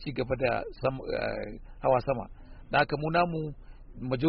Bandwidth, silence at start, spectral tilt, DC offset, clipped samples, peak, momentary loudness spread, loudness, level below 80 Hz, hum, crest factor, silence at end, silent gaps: 5.4 kHz; 0 s; -5 dB/octave; under 0.1%; under 0.1%; -10 dBFS; 13 LU; -30 LUFS; -46 dBFS; none; 18 dB; 0 s; none